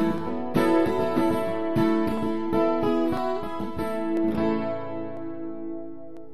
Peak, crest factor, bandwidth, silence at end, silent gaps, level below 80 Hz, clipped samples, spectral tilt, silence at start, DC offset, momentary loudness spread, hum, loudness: -10 dBFS; 16 dB; 13.5 kHz; 0 s; none; -50 dBFS; under 0.1%; -7.5 dB/octave; 0 s; 2%; 12 LU; none; -26 LUFS